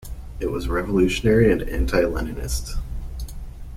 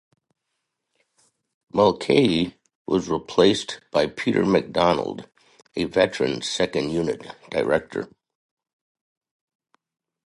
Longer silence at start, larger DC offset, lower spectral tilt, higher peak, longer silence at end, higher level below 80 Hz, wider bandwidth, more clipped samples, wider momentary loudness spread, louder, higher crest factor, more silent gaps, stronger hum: second, 0 s vs 1.75 s; neither; about the same, -6 dB/octave vs -5 dB/octave; about the same, -4 dBFS vs -4 dBFS; second, 0 s vs 2.2 s; first, -30 dBFS vs -54 dBFS; first, 16 kHz vs 11.5 kHz; neither; first, 18 LU vs 14 LU; about the same, -22 LUFS vs -22 LUFS; about the same, 18 dB vs 22 dB; second, none vs 2.75-2.85 s; neither